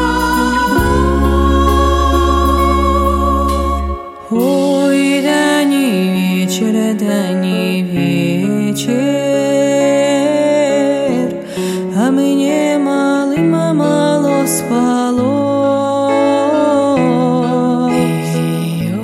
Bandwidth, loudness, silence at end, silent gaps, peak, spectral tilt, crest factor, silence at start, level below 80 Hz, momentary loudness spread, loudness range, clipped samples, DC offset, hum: 16.5 kHz; -13 LUFS; 0 s; none; -2 dBFS; -6 dB/octave; 12 dB; 0 s; -24 dBFS; 4 LU; 1 LU; under 0.1%; under 0.1%; none